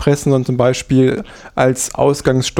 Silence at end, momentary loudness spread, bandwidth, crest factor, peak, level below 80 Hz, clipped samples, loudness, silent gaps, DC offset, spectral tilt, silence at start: 0 s; 3 LU; 16.5 kHz; 14 dB; -2 dBFS; -40 dBFS; under 0.1%; -15 LUFS; none; under 0.1%; -5.5 dB/octave; 0 s